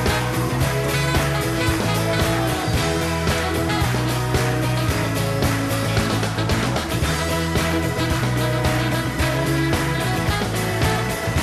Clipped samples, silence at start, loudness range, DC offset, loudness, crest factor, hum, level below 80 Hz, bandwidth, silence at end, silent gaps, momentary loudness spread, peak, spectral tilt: under 0.1%; 0 s; 1 LU; under 0.1%; -21 LUFS; 12 dB; none; -34 dBFS; 14 kHz; 0 s; none; 2 LU; -8 dBFS; -5 dB/octave